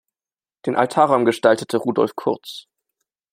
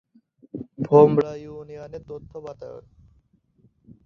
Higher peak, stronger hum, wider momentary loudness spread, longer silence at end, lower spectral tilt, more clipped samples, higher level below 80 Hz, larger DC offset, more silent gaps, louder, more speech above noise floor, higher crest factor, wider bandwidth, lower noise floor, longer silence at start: about the same, -2 dBFS vs -2 dBFS; neither; second, 13 LU vs 24 LU; second, 0.7 s vs 1.3 s; second, -5.5 dB/octave vs -9.5 dB/octave; neither; second, -66 dBFS vs -58 dBFS; neither; neither; about the same, -19 LUFS vs -18 LUFS; first, over 71 dB vs 41 dB; about the same, 20 dB vs 22 dB; first, 16 kHz vs 6.4 kHz; first, under -90 dBFS vs -62 dBFS; about the same, 0.65 s vs 0.55 s